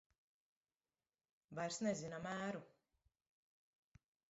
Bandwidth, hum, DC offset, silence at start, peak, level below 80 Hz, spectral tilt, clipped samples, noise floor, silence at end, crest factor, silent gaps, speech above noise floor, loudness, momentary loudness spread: 7.6 kHz; none; under 0.1%; 1.5 s; -28 dBFS; -82 dBFS; -4.5 dB/octave; under 0.1%; under -90 dBFS; 1.6 s; 22 dB; none; over 46 dB; -45 LUFS; 9 LU